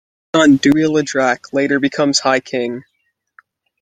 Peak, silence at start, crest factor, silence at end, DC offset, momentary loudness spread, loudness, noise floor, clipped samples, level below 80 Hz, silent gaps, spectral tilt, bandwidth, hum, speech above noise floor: 0 dBFS; 0.35 s; 16 dB; 1 s; under 0.1%; 10 LU; -15 LUFS; -68 dBFS; under 0.1%; -58 dBFS; none; -4 dB/octave; 9.4 kHz; none; 54 dB